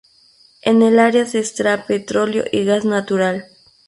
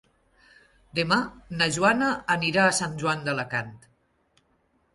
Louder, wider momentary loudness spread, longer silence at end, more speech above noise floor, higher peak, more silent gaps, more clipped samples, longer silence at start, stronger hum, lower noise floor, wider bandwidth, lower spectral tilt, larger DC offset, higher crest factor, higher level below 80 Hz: first, -17 LUFS vs -24 LUFS; about the same, 8 LU vs 10 LU; second, 0.45 s vs 1.2 s; second, 36 dB vs 43 dB; first, -2 dBFS vs -8 dBFS; neither; neither; second, 0.65 s vs 0.95 s; neither; second, -52 dBFS vs -68 dBFS; about the same, 11.5 kHz vs 11.5 kHz; first, -5 dB/octave vs -3.5 dB/octave; neither; about the same, 16 dB vs 20 dB; about the same, -60 dBFS vs -60 dBFS